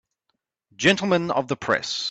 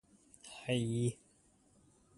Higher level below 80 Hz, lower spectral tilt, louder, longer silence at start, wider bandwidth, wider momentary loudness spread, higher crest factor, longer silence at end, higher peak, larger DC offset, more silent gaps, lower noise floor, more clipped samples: first, -62 dBFS vs -70 dBFS; second, -4 dB/octave vs -5.5 dB/octave; first, -22 LUFS vs -37 LUFS; first, 0.8 s vs 0.45 s; second, 9 kHz vs 11.5 kHz; second, 6 LU vs 22 LU; about the same, 20 dB vs 20 dB; second, 0 s vs 1.05 s; first, -4 dBFS vs -20 dBFS; neither; neither; first, -77 dBFS vs -69 dBFS; neither